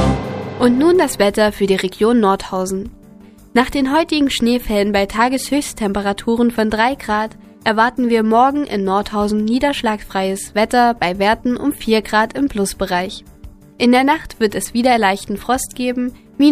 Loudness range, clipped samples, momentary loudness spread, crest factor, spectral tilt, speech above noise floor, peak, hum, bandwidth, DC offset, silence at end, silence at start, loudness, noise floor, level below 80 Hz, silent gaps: 1 LU; under 0.1%; 7 LU; 16 dB; -4.5 dB/octave; 26 dB; 0 dBFS; none; 15.5 kHz; under 0.1%; 0 s; 0 s; -16 LUFS; -42 dBFS; -38 dBFS; none